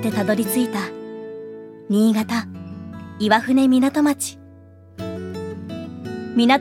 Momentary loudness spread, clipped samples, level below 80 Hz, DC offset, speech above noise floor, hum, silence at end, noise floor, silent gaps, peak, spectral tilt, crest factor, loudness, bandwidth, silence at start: 18 LU; under 0.1%; -60 dBFS; under 0.1%; 27 dB; none; 0 s; -45 dBFS; none; 0 dBFS; -5 dB/octave; 20 dB; -21 LUFS; 16.5 kHz; 0 s